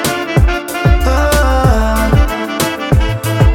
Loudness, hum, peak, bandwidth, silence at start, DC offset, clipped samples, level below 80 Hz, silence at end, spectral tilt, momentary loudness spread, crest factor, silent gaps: -13 LUFS; none; 0 dBFS; 17.5 kHz; 0 s; under 0.1%; under 0.1%; -14 dBFS; 0 s; -5.5 dB/octave; 5 LU; 10 dB; none